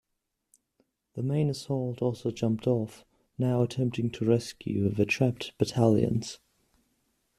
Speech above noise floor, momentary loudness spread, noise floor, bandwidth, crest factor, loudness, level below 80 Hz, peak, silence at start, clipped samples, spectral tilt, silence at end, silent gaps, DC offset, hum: 54 dB; 9 LU; -82 dBFS; 13.5 kHz; 20 dB; -29 LUFS; -60 dBFS; -8 dBFS; 1.15 s; under 0.1%; -7 dB/octave; 1.05 s; none; under 0.1%; none